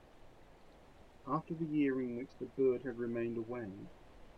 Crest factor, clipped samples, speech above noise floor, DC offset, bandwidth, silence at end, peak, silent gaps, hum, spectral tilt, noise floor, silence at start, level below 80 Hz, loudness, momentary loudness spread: 16 dB; under 0.1%; 22 dB; under 0.1%; 7.2 kHz; 0 s; -22 dBFS; none; none; -9 dB/octave; -59 dBFS; 0.05 s; -64 dBFS; -38 LUFS; 14 LU